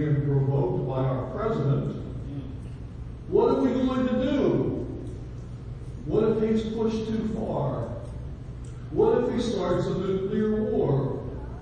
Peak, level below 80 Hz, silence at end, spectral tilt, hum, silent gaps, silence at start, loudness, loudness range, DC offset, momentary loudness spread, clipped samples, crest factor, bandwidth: -10 dBFS; -42 dBFS; 0 s; -8.5 dB/octave; none; none; 0 s; -26 LUFS; 2 LU; under 0.1%; 15 LU; under 0.1%; 16 dB; 9.2 kHz